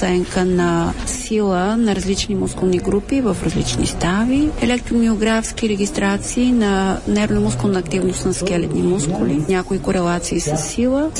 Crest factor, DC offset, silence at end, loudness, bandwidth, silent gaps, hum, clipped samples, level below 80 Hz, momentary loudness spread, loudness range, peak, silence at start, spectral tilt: 12 dB; under 0.1%; 0 s; -18 LUFS; 11.5 kHz; none; none; under 0.1%; -32 dBFS; 3 LU; 1 LU; -6 dBFS; 0 s; -5 dB/octave